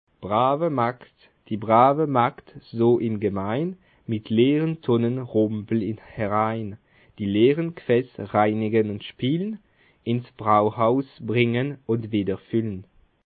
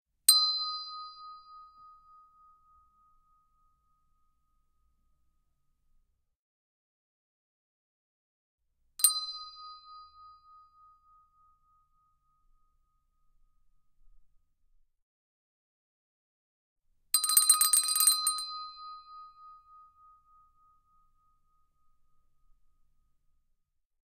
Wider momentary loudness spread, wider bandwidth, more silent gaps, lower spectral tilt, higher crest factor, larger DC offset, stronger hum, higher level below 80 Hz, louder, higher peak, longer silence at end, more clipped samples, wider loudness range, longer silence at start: second, 12 LU vs 26 LU; second, 4.7 kHz vs 14 kHz; second, none vs 6.36-8.58 s, 15.02-16.76 s; first, -12 dB/octave vs 6.5 dB/octave; second, 20 dB vs 32 dB; neither; neither; first, -62 dBFS vs -74 dBFS; about the same, -23 LUFS vs -25 LUFS; about the same, -4 dBFS vs -4 dBFS; second, 0.5 s vs 4.55 s; neither; second, 2 LU vs 17 LU; about the same, 0.2 s vs 0.3 s